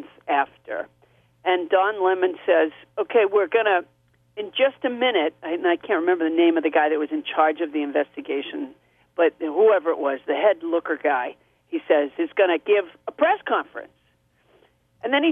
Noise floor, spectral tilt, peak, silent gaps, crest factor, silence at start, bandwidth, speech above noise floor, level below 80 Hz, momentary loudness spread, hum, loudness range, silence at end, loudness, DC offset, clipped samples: -64 dBFS; -6 dB/octave; -6 dBFS; none; 16 dB; 0 s; 3.8 kHz; 43 dB; -74 dBFS; 13 LU; 60 Hz at -60 dBFS; 2 LU; 0 s; -22 LUFS; under 0.1%; under 0.1%